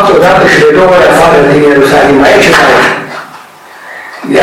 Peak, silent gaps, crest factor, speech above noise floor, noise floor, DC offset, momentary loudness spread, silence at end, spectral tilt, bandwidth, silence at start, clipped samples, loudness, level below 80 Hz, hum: 0 dBFS; none; 6 dB; 26 dB; -30 dBFS; under 0.1%; 18 LU; 0 s; -4.5 dB/octave; 16.5 kHz; 0 s; 2%; -4 LUFS; -34 dBFS; none